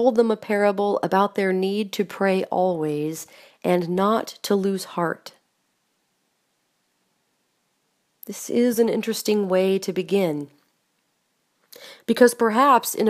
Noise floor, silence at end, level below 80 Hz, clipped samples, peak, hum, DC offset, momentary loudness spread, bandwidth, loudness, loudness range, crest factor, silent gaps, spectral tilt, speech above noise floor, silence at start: -71 dBFS; 0 s; -74 dBFS; under 0.1%; -2 dBFS; none; under 0.1%; 15 LU; 15.5 kHz; -22 LUFS; 8 LU; 22 dB; none; -5 dB/octave; 50 dB; 0 s